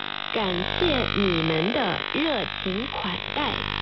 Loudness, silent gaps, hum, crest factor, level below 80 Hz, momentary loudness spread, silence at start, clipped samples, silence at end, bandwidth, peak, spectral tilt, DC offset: -25 LUFS; none; 50 Hz at -40 dBFS; 16 dB; -42 dBFS; 5 LU; 0 s; under 0.1%; 0 s; 6 kHz; -10 dBFS; -2.5 dB/octave; under 0.1%